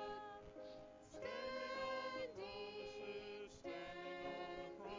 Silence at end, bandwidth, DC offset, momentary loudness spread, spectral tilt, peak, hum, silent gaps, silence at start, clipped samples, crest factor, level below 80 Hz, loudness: 0 s; 7.6 kHz; under 0.1%; 11 LU; -4 dB/octave; -36 dBFS; none; none; 0 s; under 0.1%; 14 dB; -72 dBFS; -50 LUFS